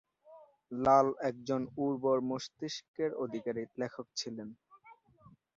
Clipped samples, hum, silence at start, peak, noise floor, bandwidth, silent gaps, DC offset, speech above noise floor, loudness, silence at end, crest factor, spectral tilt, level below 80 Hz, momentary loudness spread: under 0.1%; none; 0.3 s; -12 dBFS; -63 dBFS; 7.6 kHz; 2.88-2.94 s; under 0.1%; 29 dB; -34 LUFS; 0.65 s; 22 dB; -4.5 dB/octave; -70 dBFS; 14 LU